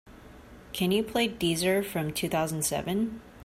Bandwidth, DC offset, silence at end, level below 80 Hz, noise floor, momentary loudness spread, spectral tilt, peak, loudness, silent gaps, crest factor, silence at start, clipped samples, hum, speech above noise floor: 16 kHz; under 0.1%; 0 s; -54 dBFS; -49 dBFS; 5 LU; -4 dB/octave; -14 dBFS; -28 LUFS; none; 16 dB; 0.05 s; under 0.1%; none; 21 dB